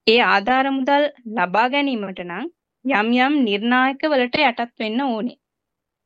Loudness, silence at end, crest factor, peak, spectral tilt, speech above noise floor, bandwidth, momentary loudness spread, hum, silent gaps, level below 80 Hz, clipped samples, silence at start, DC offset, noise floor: -19 LUFS; 0.75 s; 18 dB; -2 dBFS; -6 dB/octave; 63 dB; 7.6 kHz; 13 LU; none; none; -66 dBFS; under 0.1%; 0.05 s; under 0.1%; -82 dBFS